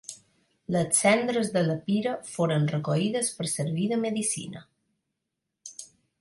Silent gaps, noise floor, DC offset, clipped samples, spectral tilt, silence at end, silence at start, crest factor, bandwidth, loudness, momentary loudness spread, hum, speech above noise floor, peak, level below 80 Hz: none; -84 dBFS; under 0.1%; under 0.1%; -4.5 dB/octave; 0.35 s; 0.1 s; 20 dB; 11.5 kHz; -26 LUFS; 21 LU; none; 57 dB; -8 dBFS; -68 dBFS